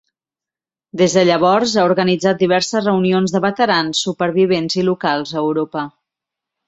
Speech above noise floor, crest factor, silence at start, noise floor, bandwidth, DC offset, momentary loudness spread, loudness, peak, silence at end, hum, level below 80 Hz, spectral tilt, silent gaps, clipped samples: 74 dB; 16 dB; 0.95 s; -89 dBFS; 8.4 kHz; under 0.1%; 6 LU; -16 LUFS; -2 dBFS; 0.8 s; none; -60 dBFS; -5 dB/octave; none; under 0.1%